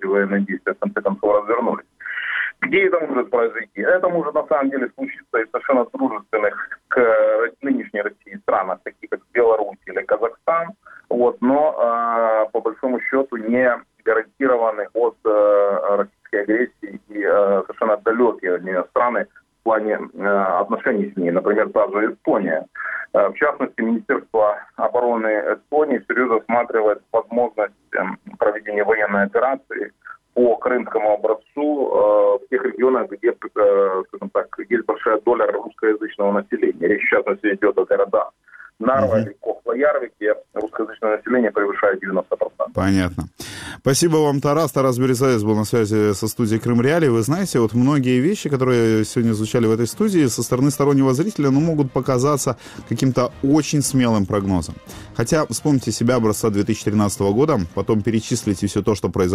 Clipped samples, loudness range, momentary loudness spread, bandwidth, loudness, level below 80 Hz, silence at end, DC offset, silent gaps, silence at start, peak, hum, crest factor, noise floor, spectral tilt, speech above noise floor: under 0.1%; 3 LU; 8 LU; 16 kHz; -19 LUFS; -52 dBFS; 0 s; under 0.1%; none; 0 s; -4 dBFS; none; 16 dB; -45 dBFS; -6 dB/octave; 27 dB